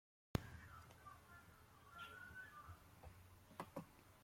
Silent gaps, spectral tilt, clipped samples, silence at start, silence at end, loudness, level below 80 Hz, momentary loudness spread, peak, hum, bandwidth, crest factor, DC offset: none; -5.5 dB/octave; under 0.1%; 0.35 s; 0 s; -56 LUFS; -68 dBFS; 15 LU; -22 dBFS; none; 16.5 kHz; 34 dB; under 0.1%